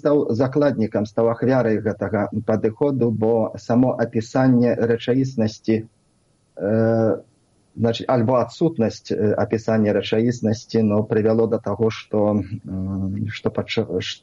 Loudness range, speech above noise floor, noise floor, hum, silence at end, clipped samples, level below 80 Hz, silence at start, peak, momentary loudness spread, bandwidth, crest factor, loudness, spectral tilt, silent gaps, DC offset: 2 LU; 42 dB; -62 dBFS; none; 0.05 s; under 0.1%; -56 dBFS; 0.05 s; -6 dBFS; 6 LU; 7.8 kHz; 14 dB; -21 LUFS; -7.5 dB/octave; none; under 0.1%